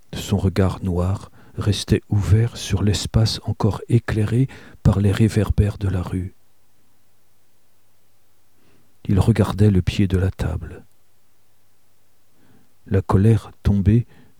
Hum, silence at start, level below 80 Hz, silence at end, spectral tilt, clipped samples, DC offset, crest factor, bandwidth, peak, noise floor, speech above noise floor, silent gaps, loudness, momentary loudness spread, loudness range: none; 0.1 s; -34 dBFS; 0.35 s; -7 dB/octave; under 0.1%; 0.5%; 18 dB; 14 kHz; -2 dBFS; -64 dBFS; 45 dB; none; -20 LUFS; 9 LU; 7 LU